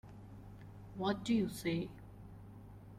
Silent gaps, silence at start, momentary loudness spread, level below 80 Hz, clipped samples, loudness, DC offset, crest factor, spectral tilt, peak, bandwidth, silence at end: none; 0.05 s; 20 LU; -60 dBFS; under 0.1%; -38 LUFS; under 0.1%; 18 dB; -6 dB/octave; -22 dBFS; 15.5 kHz; 0 s